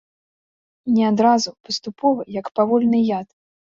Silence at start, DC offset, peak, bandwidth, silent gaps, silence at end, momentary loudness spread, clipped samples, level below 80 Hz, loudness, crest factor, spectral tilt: 0.85 s; under 0.1%; -4 dBFS; 7.6 kHz; 1.60-1.64 s; 0.55 s; 11 LU; under 0.1%; -64 dBFS; -19 LUFS; 16 dB; -5.5 dB/octave